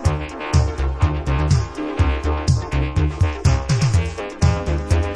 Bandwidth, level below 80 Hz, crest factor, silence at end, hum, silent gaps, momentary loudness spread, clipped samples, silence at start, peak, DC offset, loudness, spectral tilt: 11 kHz; -24 dBFS; 14 dB; 0 s; none; none; 4 LU; under 0.1%; 0 s; -4 dBFS; under 0.1%; -20 LUFS; -6 dB/octave